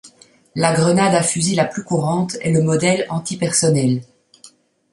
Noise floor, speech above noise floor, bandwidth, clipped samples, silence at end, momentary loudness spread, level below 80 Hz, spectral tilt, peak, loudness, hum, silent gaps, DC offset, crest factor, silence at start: -49 dBFS; 32 dB; 11.5 kHz; under 0.1%; 0.45 s; 6 LU; -56 dBFS; -5 dB/octave; 0 dBFS; -17 LUFS; none; none; under 0.1%; 18 dB; 0.05 s